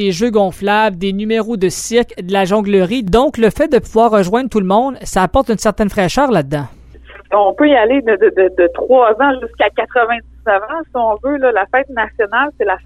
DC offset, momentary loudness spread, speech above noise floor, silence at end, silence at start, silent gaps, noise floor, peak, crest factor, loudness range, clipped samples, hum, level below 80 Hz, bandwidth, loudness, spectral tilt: under 0.1%; 6 LU; 24 dB; 0.05 s; 0 s; none; -37 dBFS; -2 dBFS; 12 dB; 3 LU; under 0.1%; none; -36 dBFS; 15.5 kHz; -14 LUFS; -5 dB/octave